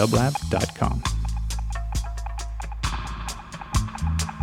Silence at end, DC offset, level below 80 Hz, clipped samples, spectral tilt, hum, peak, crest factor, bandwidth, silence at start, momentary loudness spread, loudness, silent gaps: 0 s; under 0.1%; -30 dBFS; under 0.1%; -5 dB/octave; none; -6 dBFS; 20 dB; 16 kHz; 0 s; 10 LU; -28 LUFS; none